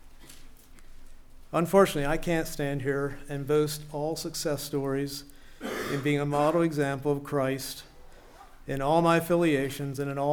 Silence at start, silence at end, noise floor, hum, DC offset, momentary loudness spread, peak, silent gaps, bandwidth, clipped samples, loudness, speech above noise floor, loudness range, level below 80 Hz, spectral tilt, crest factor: 0 s; 0 s; -50 dBFS; none; under 0.1%; 12 LU; -8 dBFS; none; 20 kHz; under 0.1%; -28 LUFS; 23 dB; 3 LU; -46 dBFS; -5.5 dB/octave; 20 dB